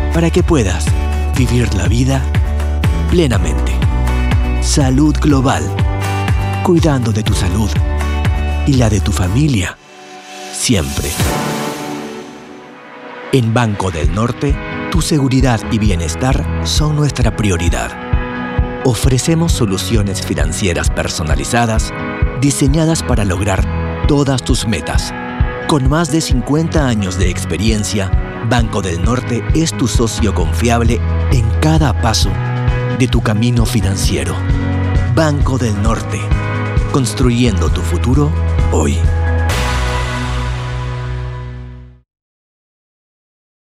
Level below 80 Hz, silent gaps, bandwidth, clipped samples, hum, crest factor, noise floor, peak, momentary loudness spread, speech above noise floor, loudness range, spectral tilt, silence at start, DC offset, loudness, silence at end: -20 dBFS; none; 15.5 kHz; under 0.1%; none; 14 dB; -35 dBFS; 0 dBFS; 7 LU; 22 dB; 4 LU; -5.5 dB/octave; 0 s; under 0.1%; -15 LUFS; 1.75 s